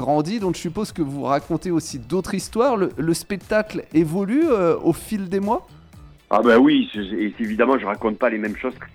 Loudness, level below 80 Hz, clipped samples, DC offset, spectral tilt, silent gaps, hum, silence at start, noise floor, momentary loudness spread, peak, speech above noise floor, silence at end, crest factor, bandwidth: -21 LUFS; -48 dBFS; under 0.1%; under 0.1%; -6 dB/octave; none; none; 0 s; -45 dBFS; 9 LU; -4 dBFS; 25 dB; 0.05 s; 16 dB; 16 kHz